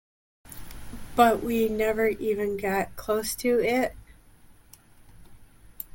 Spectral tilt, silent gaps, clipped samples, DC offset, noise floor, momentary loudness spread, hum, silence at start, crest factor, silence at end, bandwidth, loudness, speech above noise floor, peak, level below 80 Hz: -4.5 dB/octave; none; under 0.1%; under 0.1%; -54 dBFS; 22 LU; none; 0.45 s; 22 dB; 0.1 s; 17 kHz; -25 LUFS; 29 dB; -6 dBFS; -48 dBFS